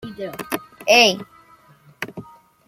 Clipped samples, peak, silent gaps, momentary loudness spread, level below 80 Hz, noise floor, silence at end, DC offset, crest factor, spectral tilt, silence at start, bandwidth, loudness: under 0.1%; 0 dBFS; none; 20 LU; -62 dBFS; -51 dBFS; 0.45 s; under 0.1%; 22 dB; -2 dB/octave; 0.05 s; 16.5 kHz; -17 LUFS